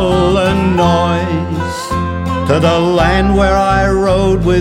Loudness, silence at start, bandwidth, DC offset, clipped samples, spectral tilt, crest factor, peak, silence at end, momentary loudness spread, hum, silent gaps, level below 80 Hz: -13 LUFS; 0 s; 15 kHz; under 0.1%; under 0.1%; -6.5 dB/octave; 12 dB; 0 dBFS; 0 s; 7 LU; none; none; -24 dBFS